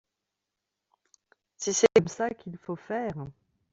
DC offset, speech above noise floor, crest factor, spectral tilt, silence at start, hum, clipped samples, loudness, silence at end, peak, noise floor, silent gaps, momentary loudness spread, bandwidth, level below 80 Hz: under 0.1%; 59 dB; 22 dB; -4 dB/octave; 1.6 s; none; under 0.1%; -27 LUFS; 0.4 s; -8 dBFS; -86 dBFS; none; 19 LU; 8.2 kHz; -66 dBFS